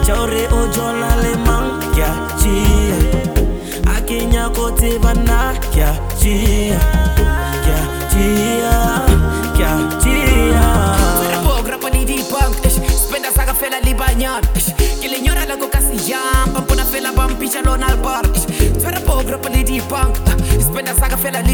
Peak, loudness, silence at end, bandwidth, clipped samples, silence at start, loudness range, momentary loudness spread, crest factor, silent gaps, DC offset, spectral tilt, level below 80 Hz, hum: 0 dBFS; -16 LUFS; 0 s; over 20 kHz; under 0.1%; 0 s; 2 LU; 4 LU; 14 dB; none; 0.2%; -4.5 dB/octave; -16 dBFS; none